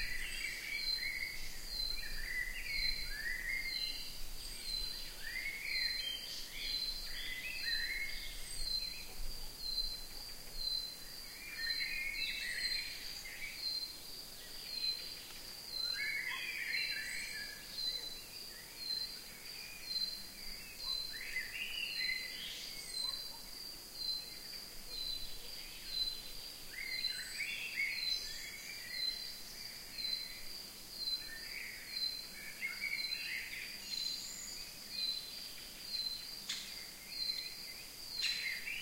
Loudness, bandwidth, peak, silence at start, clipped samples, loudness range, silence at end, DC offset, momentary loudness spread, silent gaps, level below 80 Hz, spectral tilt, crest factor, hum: -40 LUFS; 16 kHz; -24 dBFS; 0 s; under 0.1%; 3 LU; 0 s; under 0.1%; 10 LU; none; -54 dBFS; 0.5 dB/octave; 18 dB; none